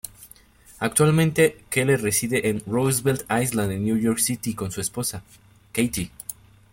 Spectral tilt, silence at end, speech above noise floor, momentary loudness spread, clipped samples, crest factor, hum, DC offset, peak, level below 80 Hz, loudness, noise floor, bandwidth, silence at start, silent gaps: -4.5 dB/octave; 0.4 s; 28 dB; 11 LU; under 0.1%; 18 dB; none; under 0.1%; -4 dBFS; -52 dBFS; -23 LUFS; -51 dBFS; 17 kHz; 0.05 s; none